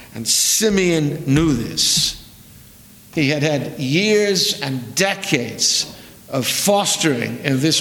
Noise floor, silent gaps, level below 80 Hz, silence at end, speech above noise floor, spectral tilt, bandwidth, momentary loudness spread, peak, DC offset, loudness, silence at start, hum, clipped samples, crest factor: -44 dBFS; none; -44 dBFS; 0 s; 26 dB; -3 dB/octave; 19.5 kHz; 8 LU; 0 dBFS; under 0.1%; -17 LUFS; 0 s; none; under 0.1%; 18 dB